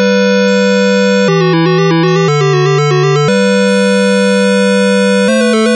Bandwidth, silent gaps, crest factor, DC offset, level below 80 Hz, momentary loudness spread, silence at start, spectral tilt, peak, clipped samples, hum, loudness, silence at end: 11.5 kHz; none; 4 dB; under 0.1%; -62 dBFS; 1 LU; 0 s; -5.5 dB/octave; -4 dBFS; under 0.1%; none; -9 LUFS; 0 s